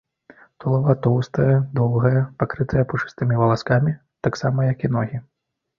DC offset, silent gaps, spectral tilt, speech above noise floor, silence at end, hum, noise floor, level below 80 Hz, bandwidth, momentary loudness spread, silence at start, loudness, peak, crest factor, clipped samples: under 0.1%; none; -8.5 dB/octave; 31 dB; 0.55 s; none; -51 dBFS; -48 dBFS; 7 kHz; 7 LU; 0.6 s; -21 LUFS; -2 dBFS; 18 dB; under 0.1%